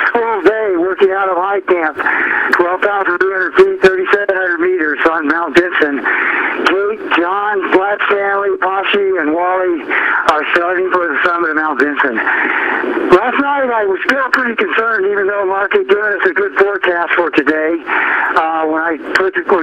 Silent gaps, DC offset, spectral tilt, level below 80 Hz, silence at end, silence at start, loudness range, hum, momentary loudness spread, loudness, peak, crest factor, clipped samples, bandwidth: none; under 0.1%; -4.5 dB/octave; -52 dBFS; 0 s; 0 s; 1 LU; none; 3 LU; -13 LUFS; 0 dBFS; 14 dB; under 0.1%; 9.4 kHz